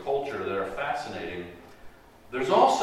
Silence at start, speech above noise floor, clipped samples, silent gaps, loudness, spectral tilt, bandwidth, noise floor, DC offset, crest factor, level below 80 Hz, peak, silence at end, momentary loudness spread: 0 s; 23 dB; under 0.1%; none; -28 LUFS; -4.5 dB/octave; 15.5 kHz; -48 dBFS; under 0.1%; 20 dB; -58 dBFS; -8 dBFS; 0 s; 18 LU